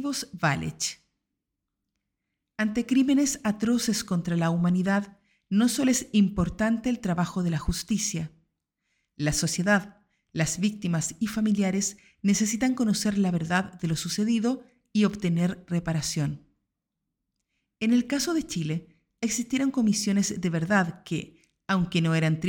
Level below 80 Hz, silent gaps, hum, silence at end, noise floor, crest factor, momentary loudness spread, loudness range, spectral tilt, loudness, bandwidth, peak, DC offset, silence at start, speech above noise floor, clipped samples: -50 dBFS; none; none; 0 s; -84 dBFS; 16 dB; 7 LU; 4 LU; -5 dB/octave; -26 LUFS; 18 kHz; -10 dBFS; under 0.1%; 0 s; 58 dB; under 0.1%